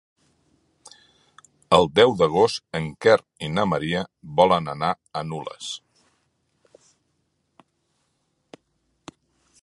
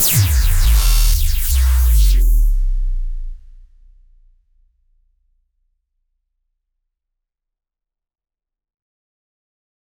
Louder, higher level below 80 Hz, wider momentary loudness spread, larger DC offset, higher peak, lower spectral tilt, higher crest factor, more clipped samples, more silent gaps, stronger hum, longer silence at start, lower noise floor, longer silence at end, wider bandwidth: second, -22 LUFS vs -17 LUFS; second, -56 dBFS vs -18 dBFS; about the same, 15 LU vs 14 LU; neither; about the same, -2 dBFS vs -4 dBFS; first, -5 dB/octave vs -3 dB/octave; first, 24 dB vs 14 dB; neither; neither; neither; first, 1.7 s vs 0 s; second, -72 dBFS vs -84 dBFS; second, 3.85 s vs 6.6 s; second, 11.5 kHz vs over 20 kHz